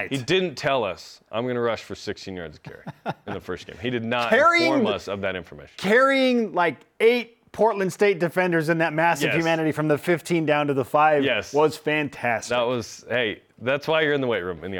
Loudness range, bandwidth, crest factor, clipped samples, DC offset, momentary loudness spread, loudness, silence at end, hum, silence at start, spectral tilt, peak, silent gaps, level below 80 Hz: 6 LU; 19 kHz; 16 dB; under 0.1%; under 0.1%; 15 LU; -22 LUFS; 0 s; none; 0 s; -5 dB/octave; -6 dBFS; none; -62 dBFS